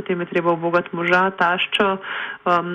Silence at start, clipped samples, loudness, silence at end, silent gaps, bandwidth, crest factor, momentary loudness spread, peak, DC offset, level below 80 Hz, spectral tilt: 0 s; under 0.1%; -20 LUFS; 0 s; none; 9.6 kHz; 16 dB; 7 LU; -4 dBFS; under 0.1%; -60 dBFS; -6 dB/octave